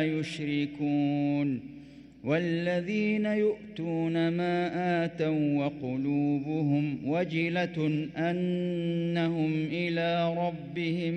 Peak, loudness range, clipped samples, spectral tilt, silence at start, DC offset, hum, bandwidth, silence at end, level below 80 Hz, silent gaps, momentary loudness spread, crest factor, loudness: -16 dBFS; 1 LU; under 0.1%; -8 dB/octave; 0 s; under 0.1%; none; 9 kHz; 0 s; -66 dBFS; none; 5 LU; 12 dB; -29 LUFS